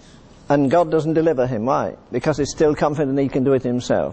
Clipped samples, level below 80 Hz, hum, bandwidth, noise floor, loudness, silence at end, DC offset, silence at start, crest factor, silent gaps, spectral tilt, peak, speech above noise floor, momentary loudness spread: under 0.1%; -46 dBFS; none; 8.6 kHz; -45 dBFS; -19 LUFS; 0 s; under 0.1%; 0.5 s; 14 dB; none; -6.5 dB/octave; -4 dBFS; 27 dB; 5 LU